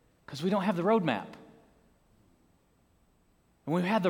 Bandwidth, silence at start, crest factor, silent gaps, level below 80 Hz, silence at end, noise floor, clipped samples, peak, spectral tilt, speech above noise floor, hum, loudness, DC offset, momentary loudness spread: 17 kHz; 0.3 s; 20 dB; none; -72 dBFS; 0 s; -68 dBFS; under 0.1%; -12 dBFS; -7 dB/octave; 40 dB; none; -30 LUFS; under 0.1%; 19 LU